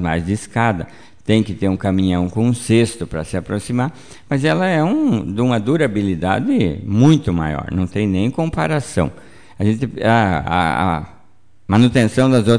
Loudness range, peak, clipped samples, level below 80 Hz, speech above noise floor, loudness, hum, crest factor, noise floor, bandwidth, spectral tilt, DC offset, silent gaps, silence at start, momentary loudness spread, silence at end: 2 LU; -2 dBFS; under 0.1%; -40 dBFS; 39 dB; -17 LUFS; none; 16 dB; -55 dBFS; 10 kHz; -6.5 dB/octave; 0.8%; none; 0 s; 9 LU; 0 s